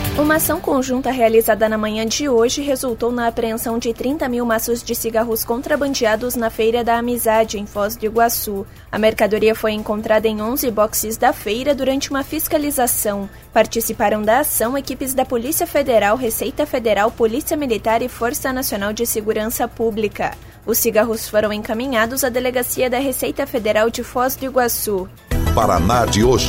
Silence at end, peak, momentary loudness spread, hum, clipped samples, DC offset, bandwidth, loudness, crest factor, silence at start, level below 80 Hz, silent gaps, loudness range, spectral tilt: 0 s; -2 dBFS; 6 LU; none; under 0.1%; under 0.1%; 16.5 kHz; -18 LUFS; 16 dB; 0 s; -36 dBFS; none; 2 LU; -4 dB/octave